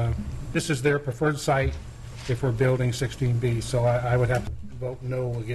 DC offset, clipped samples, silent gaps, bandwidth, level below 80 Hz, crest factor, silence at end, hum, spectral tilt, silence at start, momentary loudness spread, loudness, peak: under 0.1%; under 0.1%; none; 12.5 kHz; -40 dBFS; 14 dB; 0 s; none; -6 dB/octave; 0 s; 11 LU; -26 LUFS; -12 dBFS